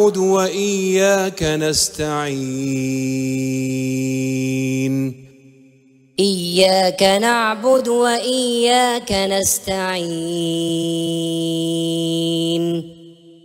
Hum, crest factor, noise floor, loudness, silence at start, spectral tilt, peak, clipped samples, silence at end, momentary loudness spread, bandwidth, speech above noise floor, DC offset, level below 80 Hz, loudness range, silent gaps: none; 16 dB; -51 dBFS; -18 LUFS; 0 s; -4 dB/octave; -2 dBFS; under 0.1%; 0.15 s; 7 LU; 16 kHz; 33 dB; under 0.1%; -48 dBFS; 6 LU; none